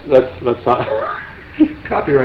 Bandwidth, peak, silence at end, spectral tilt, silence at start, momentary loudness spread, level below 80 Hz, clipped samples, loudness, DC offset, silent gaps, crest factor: 5.8 kHz; 0 dBFS; 0 s; -8.5 dB/octave; 0 s; 11 LU; -42 dBFS; under 0.1%; -17 LUFS; under 0.1%; none; 16 dB